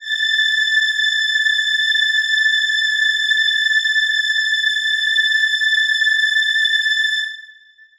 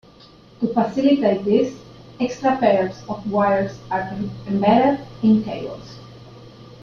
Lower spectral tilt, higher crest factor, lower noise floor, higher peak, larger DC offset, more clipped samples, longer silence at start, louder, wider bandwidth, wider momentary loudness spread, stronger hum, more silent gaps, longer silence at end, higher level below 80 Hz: second, 7 dB/octave vs -7.5 dB/octave; second, 12 dB vs 18 dB; about the same, -46 dBFS vs -47 dBFS; second, -6 dBFS vs -2 dBFS; neither; neither; second, 0 s vs 0.6 s; first, -15 LUFS vs -20 LUFS; first, 18.5 kHz vs 7 kHz; second, 2 LU vs 13 LU; neither; neither; first, 0.5 s vs 0 s; second, -64 dBFS vs -54 dBFS